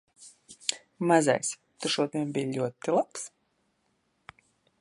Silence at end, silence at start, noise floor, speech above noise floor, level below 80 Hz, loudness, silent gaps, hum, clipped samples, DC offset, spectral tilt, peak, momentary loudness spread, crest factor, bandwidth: 1.55 s; 0.2 s; -74 dBFS; 46 dB; -78 dBFS; -29 LUFS; none; none; under 0.1%; under 0.1%; -4 dB/octave; -6 dBFS; 13 LU; 26 dB; 11.5 kHz